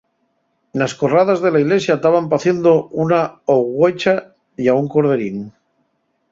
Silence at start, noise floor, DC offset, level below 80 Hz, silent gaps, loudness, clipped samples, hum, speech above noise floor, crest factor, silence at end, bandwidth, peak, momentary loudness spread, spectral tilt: 0.75 s; -66 dBFS; under 0.1%; -60 dBFS; none; -16 LUFS; under 0.1%; none; 51 dB; 14 dB; 0.85 s; 7.8 kHz; -2 dBFS; 7 LU; -6.5 dB/octave